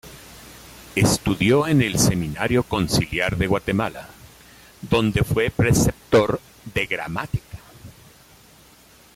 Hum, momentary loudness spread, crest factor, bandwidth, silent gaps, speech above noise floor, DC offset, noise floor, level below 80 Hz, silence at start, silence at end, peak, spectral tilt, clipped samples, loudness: none; 23 LU; 16 dB; 16.5 kHz; none; 30 dB; under 0.1%; -51 dBFS; -40 dBFS; 0.05 s; 1.25 s; -6 dBFS; -5 dB/octave; under 0.1%; -21 LUFS